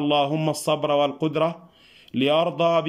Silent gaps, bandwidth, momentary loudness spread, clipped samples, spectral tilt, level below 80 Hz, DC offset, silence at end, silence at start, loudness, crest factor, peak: none; 16 kHz; 5 LU; under 0.1%; -5.5 dB/octave; -68 dBFS; under 0.1%; 0 s; 0 s; -23 LUFS; 14 dB; -8 dBFS